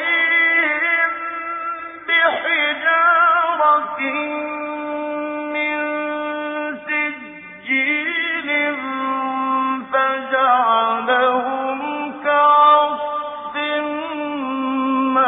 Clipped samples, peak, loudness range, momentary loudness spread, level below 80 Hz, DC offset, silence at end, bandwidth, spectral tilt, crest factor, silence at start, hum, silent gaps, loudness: under 0.1%; -4 dBFS; 6 LU; 11 LU; -68 dBFS; under 0.1%; 0 s; 3.9 kHz; -6 dB/octave; 16 dB; 0 s; none; none; -18 LUFS